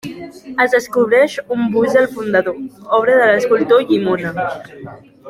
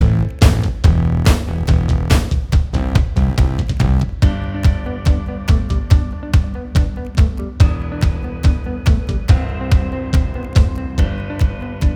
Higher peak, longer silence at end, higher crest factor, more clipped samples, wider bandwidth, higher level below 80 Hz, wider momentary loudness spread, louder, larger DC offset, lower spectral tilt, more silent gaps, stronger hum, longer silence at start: about the same, -2 dBFS vs 0 dBFS; about the same, 0 s vs 0 s; about the same, 14 dB vs 14 dB; neither; about the same, 15 kHz vs 14 kHz; second, -56 dBFS vs -18 dBFS; first, 17 LU vs 5 LU; about the same, -15 LUFS vs -17 LUFS; neither; second, -5.5 dB/octave vs -7 dB/octave; neither; neither; about the same, 0.05 s vs 0 s